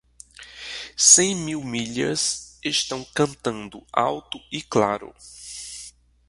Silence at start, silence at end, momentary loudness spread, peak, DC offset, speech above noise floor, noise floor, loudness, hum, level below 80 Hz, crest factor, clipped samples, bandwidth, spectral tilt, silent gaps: 0.4 s; 0.4 s; 23 LU; 0 dBFS; under 0.1%; 23 dB; -46 dBFS; -21 LUFS; none; -58 dBFS; 24 dB; under 0.1%; 11.5 kHz; -2 dB/octave; none